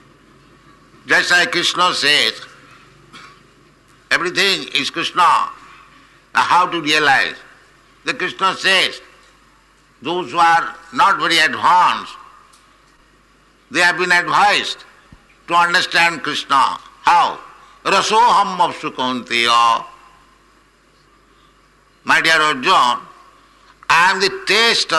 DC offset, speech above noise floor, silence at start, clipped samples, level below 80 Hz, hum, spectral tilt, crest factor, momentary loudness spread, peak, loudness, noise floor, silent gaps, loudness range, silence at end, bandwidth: under 0.1%; 38 dB; 1.05 s; under 0.1%; -58 dBFS; none; -1.5 dB/octave; 14 dB; 12 LU; -4 dBFS; -15 LUFS; -53 dBFS; none; 3 LU; 0 s; 12 kHz